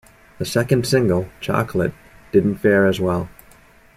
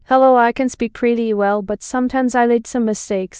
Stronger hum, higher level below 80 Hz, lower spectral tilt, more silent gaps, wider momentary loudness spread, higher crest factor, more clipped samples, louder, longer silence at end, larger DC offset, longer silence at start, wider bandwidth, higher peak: neither; about the same, -48 dBFS vs -50 dBFS; about the same, -6 dB/octave vs -5 dB/octave; neither; about the same, 9 LU vs 9 LU; about the same, 16 dB vs 14 dB; neither; about the same, -19 LUFS vs -17 LUFS; first, 0.65 s vs 0 s; neither; first, 0.4 s vs 0.1 s; first, 16 kHz vs 9.8 kHz; about the same, -2 dBFS vs -2 dBFS